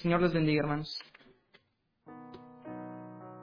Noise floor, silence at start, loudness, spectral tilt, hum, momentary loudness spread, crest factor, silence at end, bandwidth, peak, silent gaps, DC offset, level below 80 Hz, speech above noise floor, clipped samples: -75 dBFS; 0 s; -32 LUFS; -8 dB/octave; none; 24 LU; 20 dB; 0 s; 5.2 kHz; -14 dBFS; none; under 0.1%; -58 dBFS; 45 dB; under 0.1%